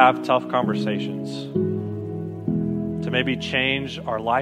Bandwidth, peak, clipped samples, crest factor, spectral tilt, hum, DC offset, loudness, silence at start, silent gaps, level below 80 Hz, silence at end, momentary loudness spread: 10.5 kHz; 0 dBFS; under 0.1%; 22 dB; -6.5 dB/octave; none; under 0.1%; -24 LUFS; 0 s; none; -52 dBFS; 0 s; 8 LU